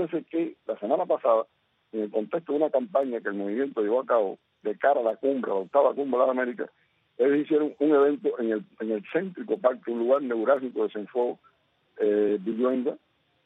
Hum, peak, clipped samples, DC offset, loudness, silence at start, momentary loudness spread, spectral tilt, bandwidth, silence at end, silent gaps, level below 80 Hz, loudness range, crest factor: none; -8 dBFS; under 0.1%; under 0.1%; -26 LUFS; 0 s; 9 LU; -8.5 dB/octave; 4 kHz; 0.5 s; none; -80 dBFS; 3 LU; 20 dB